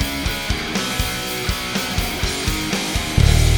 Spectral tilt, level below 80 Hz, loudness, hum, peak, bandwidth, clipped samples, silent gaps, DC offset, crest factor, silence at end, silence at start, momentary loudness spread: -4 dB/octave; -24 dBFS; -21 LUFS; none; 0 dBFS; over 20 kHz; under 0.1%; none; under 0.1%; 18 dB; 0 s; 0 s; 5 LU